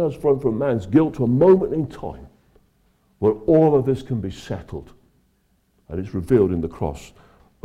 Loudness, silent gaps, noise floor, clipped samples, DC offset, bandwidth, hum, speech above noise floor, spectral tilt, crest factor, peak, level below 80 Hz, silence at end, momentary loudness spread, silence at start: -20 LUFS; none; -64 dBFS; under 0.1%; under 0.1%; 11.5 kHz; none; 44 dB; -9 dB/octave; 16 dB; -6 dBFS; -46 dBFS; 0.6 s; 18 LU; 0 s